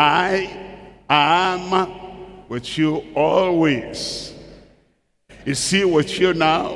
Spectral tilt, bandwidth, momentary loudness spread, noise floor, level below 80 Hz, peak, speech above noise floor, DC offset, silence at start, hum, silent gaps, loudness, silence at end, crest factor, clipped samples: -4 dB/octave; 12 kHz; 18 LU; -63 dBFS; -50 dBFS; 0 dBFS; 45 dB; under 0.1%; 0 s; none; none; -19 LUFS; 0 s; 20 dB; under 0.1%